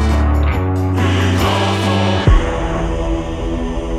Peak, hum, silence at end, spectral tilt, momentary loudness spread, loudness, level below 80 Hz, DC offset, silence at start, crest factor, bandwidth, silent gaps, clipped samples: 0 dBFS; none; 0 s; -6.5 dB/octave; 7 LU; -16 LUFS; -20 dBFS; under 0.1%; 0 s; 14 dB; 13 kHz; none; under 0.1%